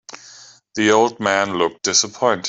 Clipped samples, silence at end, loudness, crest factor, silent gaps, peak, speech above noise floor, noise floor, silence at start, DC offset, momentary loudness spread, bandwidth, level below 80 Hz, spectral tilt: under 0.1%; 0 s; -17 LUFS; 18 dB; none; -2 dBFS; 27 dB; -45 dBFS; 0.15 s; under 0.1%; 17 LU; 8.4 kHz; -62 dBFS; -2 dB/octave